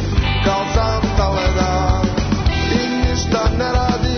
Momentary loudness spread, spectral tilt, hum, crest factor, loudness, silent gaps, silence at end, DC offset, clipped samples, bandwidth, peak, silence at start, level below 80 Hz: 1 LU; -5.5 dB/octave; none; 12 dB; -17 LUFS; none; 0 s; under 0.1%; under 0.1%; 6.6 kHz; -4 dBFS; 0 s; -22 dBFS